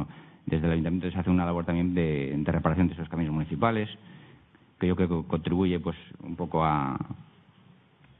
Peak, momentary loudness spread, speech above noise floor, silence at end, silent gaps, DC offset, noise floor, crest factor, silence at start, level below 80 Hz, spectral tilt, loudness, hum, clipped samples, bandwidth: -6 dBFS; 12 LU; 31 dB; 0.95 s; none; under 0.1%; -58 dBFS; 22 dB; 0 s; -48 dBFS; -12 dB/octave; -28 LUFS; none; under 0.1%; 4 kHz